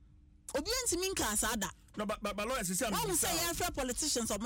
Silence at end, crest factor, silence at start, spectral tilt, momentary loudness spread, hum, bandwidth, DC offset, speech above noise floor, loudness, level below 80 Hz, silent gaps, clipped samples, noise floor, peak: 0 s; 14 dB; 0 s; -2 dB/octave; 8 LU; none; 17.5 kHz; under 0.1%; 20 dB; -33 LUFS; -52 dBFS; none; under 0.1%; -55 dBFS; -20 dBFS